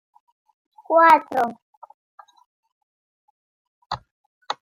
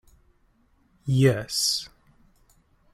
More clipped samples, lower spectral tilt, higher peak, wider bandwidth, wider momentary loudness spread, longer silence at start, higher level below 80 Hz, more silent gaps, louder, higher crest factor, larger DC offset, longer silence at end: neither; about the same, -4 dB/octave vs -4.5 dB/octave; first, -2 dBFS vs -8 dBFS; about the same, 16 kHz vs 15.5 kHz; first, 20 LU vs 16 LU; second, 0.9 s vs 1.05 s; second, -66 dBFS vs -58 dBFS; first, 1.62-1.82 s, 1.94-2.18 s, 2.46-2.63 s, 2.72-3.90 s, 4.11-4.41 s vs none; first, -17 LUFS vs -23 LUFS; about the same, 22 dB vs 20 dB; neither; second, 0.1 s vs 1.05 s